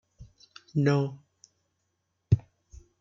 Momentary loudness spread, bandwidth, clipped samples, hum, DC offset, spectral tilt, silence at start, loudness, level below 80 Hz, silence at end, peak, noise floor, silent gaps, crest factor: 22 LU; 7.4 kHz; under 0.1%; none; under 0.1%; -8 dB/octave; 0.2 s; -28 LUFS; -52 dBFS; 0.6 s; -8 dBFS; -78 dBFS; none; 22 dB